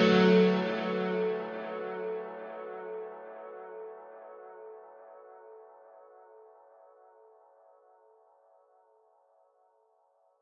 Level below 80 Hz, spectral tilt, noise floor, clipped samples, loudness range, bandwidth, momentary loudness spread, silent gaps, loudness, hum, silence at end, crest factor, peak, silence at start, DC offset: -80 dBFS; -7.5 dB/octave; -69 dBFS; under 0.1%; 26 LU; 7 kHz; 28 LU; none; -30 LUFS; none; 4 s; 22 dB; -12 dBFS; 0 s; under 0.1%